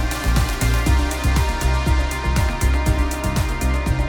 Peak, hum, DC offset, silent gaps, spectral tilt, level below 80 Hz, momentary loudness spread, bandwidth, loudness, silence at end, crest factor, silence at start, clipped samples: -6 dBFS; none; under 0.1%; none; -5 dB/octave; -20 dBFS; 3 LU; over 20 kHz; -20 LUFS; 0 s; 12 dB; 0 s; under 0.1%